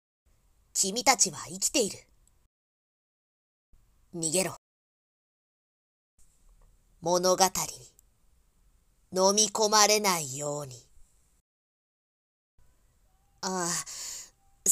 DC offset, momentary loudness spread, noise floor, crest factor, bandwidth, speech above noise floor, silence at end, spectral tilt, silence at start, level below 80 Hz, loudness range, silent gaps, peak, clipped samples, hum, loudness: under 0.1%; 16 LU; -66 dBFS; 28 dB; 16 kHz; 39 dB; 0 s; -1.5 dB/octave; 0.75 s; -64 dBFS; 11 LU; 2.46-3.73 s, 4.58-6.18 s, 11.41-12.58 s; -4 dBFS; under 0.1%; none; -26 LUFS